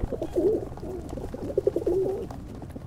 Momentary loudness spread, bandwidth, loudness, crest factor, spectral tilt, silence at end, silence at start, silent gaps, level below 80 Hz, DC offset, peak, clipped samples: 12 LU; 15 kHz; -29 LUFS; 18 dB; -8.5 dB/octave; 0 s; 0 s; none; -42 dBFS; under 0.1%; -10 dBFS; under 0.1%